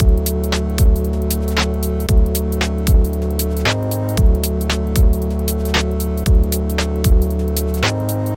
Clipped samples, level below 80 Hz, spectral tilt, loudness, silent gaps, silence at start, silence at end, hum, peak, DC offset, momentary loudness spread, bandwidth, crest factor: under 0.1%; -18 dBFS; -5.5 dB/octave; -18 LUFS; none; 0 s; 0 s; none; -2 dBFS; under 0.1%; 4 LU; 17 kHz; 14 dB